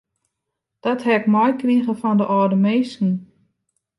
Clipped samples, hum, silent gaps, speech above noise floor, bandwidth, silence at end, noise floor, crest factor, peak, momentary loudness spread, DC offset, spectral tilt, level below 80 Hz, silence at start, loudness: under 0.1%; none; none; 62 dB; 11 kHz; 0.75 s; -80 dBFS; 16 dB; -4 dBFS; 6 LU; under 0.1%; -8 dB/octave; -70 dBFS; 0.85 s; -19 LUFS